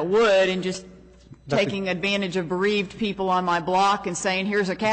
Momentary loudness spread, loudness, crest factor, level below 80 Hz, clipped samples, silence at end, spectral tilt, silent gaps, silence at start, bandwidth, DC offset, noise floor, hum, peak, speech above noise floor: 8 LU; -23 LUFS; 12 dB; -54 dBFS; under 0.1%; 0 s; -4.5 dB/octave; none; 0 s; 8.4 kHz; under 0.1%; -48 dBFS; none; -12 dBFS; 25 dB